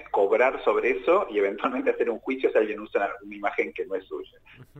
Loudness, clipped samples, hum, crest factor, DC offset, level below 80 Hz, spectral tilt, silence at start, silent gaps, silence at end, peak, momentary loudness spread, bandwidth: -25 LUFS; under 0.1%; none; 18 dB; under 0.1%; -60 dBFS; -6 dB/octave; 0 s; none; 0 s; -8 dBFS; 10 LU; 7.8 kHz